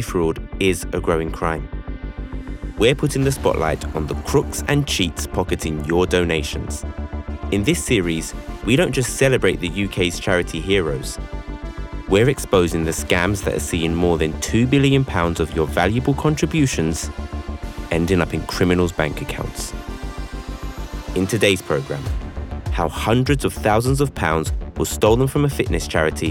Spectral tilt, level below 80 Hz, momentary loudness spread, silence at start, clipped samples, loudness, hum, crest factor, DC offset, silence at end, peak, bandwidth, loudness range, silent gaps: -5 dB/octave; -32 dBFS; 14 LU; 0 s; under 0.1%; -20 LUFS; none; 14 dB; under 0.1%; 0 s; -4 dBFS; 18 kHz; 4 LU; none